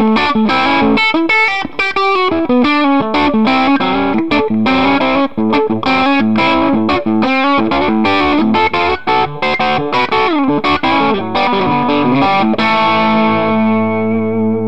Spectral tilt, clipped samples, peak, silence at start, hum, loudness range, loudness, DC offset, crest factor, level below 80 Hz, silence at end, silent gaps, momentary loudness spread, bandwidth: -6.5 dB/octave; under 0.1%; 0 dBFS; 0 s; none; 1 LU; -12 LUFS; 3%; 12 dB; -40 dBFS; 0 s; none; 3 LU; 8.2 kHz